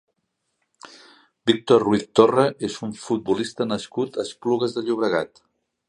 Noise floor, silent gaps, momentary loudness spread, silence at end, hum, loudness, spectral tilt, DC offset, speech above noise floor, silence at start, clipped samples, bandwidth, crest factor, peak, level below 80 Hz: -76 dBFS; none; 10 LU; 0.65 s; none; -22 LUFS; -5.5 dB/octave; under 0.1%; 54 dB; 0.85 s; under 0.1%; 11 kHz; 22 dB; 0 dBFS; -62 dBFS